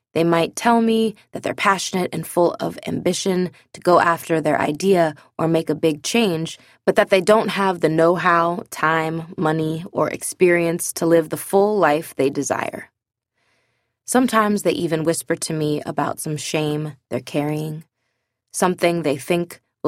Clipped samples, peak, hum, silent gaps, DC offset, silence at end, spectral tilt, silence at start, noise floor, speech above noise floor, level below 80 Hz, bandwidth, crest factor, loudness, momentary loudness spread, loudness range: under 0.1%; -2 dBFS; none; none; under 0.1%; 0 s; -5 dB/octave; 0.15 s; -74 dBFS; 55 dB; -62 dBFS; 16 kHz; 18 dB; -20 LUFS; 9 LU; 5 LU